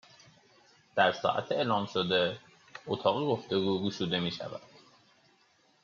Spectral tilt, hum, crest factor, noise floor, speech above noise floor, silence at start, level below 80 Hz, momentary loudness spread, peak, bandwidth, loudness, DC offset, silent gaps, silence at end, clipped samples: -3 dB/octave; none; 20 dB; -67 dBFS; 37 dB; 0.95 s; -74 dBFS; 15 LU; -12 dBFS; 7.4 kHz; -30 LUFS; under 0.1%; none; 1.2 s; under 0.1%